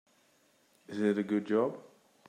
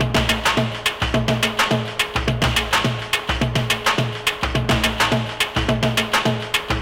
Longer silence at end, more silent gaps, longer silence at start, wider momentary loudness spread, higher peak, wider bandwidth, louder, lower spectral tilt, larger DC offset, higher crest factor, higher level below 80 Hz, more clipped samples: first, 0.5 s vs 0 s; neither; first, 0.9 s vs 0 s; first, 13 LU vs 4 LU; second, -16 dBFS vs -8 dBFS; second, 9.8 kHz vs 17 kHz; second, -32 LUFS vs -19 LUFS; first, -7.5 dB/octave vs -4 dB/octave; neither; first, 18 dB vs 12 dB; second, -86 dBFS vs -32 dBFS; neither